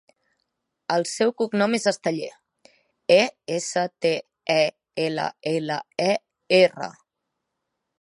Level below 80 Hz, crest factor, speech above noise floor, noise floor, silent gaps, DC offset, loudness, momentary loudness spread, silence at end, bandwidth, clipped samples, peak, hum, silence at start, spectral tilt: -76 dBFS; 22 dB; 59 dB; -81 dBFS; none; under 0.1%; -23 LUFS; 10 LU; 1.1 s; 11.5 kHz; under 0.1%; -4 dBFS; none; 0.9 s; -4 dB/octave